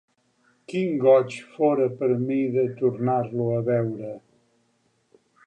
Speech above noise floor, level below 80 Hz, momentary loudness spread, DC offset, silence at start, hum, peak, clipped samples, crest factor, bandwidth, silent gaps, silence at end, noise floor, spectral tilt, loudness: 45 dB; -70 dBFS; 13 LU; under 0.1%; 0.7 s; none; -6 dBFS; under 0.1%; 18 dB; 9.2 kHz; none; 1.3 s; -68 dBFS; -8.5 dB/octave; -23 LUFS